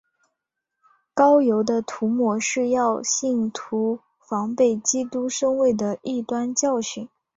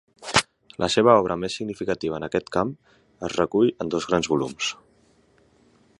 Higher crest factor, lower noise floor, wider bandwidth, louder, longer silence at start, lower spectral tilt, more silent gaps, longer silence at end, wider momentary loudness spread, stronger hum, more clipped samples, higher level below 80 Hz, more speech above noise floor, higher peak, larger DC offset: second, 16 dB vs 22 dB; first, -81 dBFS vs -60 dBFS; second, 8 kHz vs 11.5 kHz; about the same, -22 LUFS vs -23 LUFS; first, 1.15 s vs 0.2 s; about the same, -3.5 dB/octave vs -4 dB/octave; neither; second, 0.3 s vs 1.25 s; about the same, 10 LU vs 11 LU; neither; neither; second, -66 dBFS vs -54 dBFS; first, 60 dB vs 37 dB; second, -6 dBFS vs -2 dBFS; neither